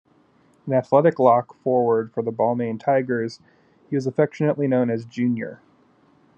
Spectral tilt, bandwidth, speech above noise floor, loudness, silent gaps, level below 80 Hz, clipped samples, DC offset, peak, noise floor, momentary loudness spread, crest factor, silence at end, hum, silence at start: -8.5 dB/octave; 8 kHz; 37 dB; -22 LUFS; none; -74 dBFS; under 0.1%; under 0.1%; -2 dBFS; -58 dBFS; 10 LU; 20 dB; 0.8 s; none; 0.65 s